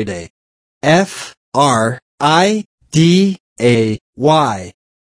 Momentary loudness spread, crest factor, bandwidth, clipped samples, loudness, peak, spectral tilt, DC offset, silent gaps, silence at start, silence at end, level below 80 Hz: 12 LU; 14 dB; 11 kHz; under 0.1%; -14 LUFS; 0 dBFS; -5.5 dB/octave; under 0.1%; 0.30-0.81 s, 1.37-1.52 s, 2.02-2.18 s, 2.65-2.78 s, 3.40-3.56 s, 4.01-4.13 s; 0 s; 0.5 s; -50 dBFS